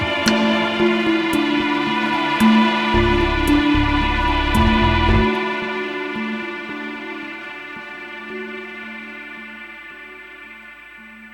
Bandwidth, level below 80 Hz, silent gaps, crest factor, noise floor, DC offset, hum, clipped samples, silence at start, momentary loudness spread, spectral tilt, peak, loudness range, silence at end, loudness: 17 kHz; -30 dBFS; none; 20 dB; -40 dBFS; under 0.1%; 50 Hz at -45 dBFS; under 0.1%; 0 s; 19 LU; -5.5 dB/octave; 0 dBFS; 15 LU; 0 s; -18 LUFS